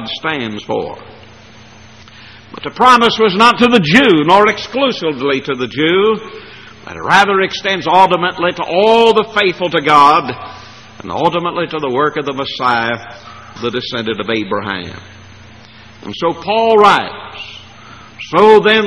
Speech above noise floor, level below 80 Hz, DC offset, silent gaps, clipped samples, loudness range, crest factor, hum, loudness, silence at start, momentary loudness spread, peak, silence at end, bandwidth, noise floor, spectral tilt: 26 dB; -50 dBFS; 0.4%; none; 0.2%; 8 LU; 14 dB; none; -12 LUFS; 0 s; 22 LU; 0 dBFS; 0 s; 11.5 kHz; -39 dBFS; -5 dB/octave